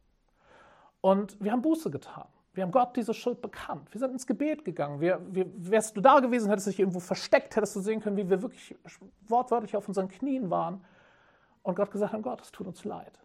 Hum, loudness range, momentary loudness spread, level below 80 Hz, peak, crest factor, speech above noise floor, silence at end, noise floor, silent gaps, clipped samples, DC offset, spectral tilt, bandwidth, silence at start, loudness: none; 6 LU; 14 LU; -70 dBFS; -8 dBFS; 22 dB; 38 dB; 0.2 s; -67 dBFS; none; under 0.1%; under 0.1%; -6 dB/octave; 15.5 kHz; 1.05 s; -29 LUFS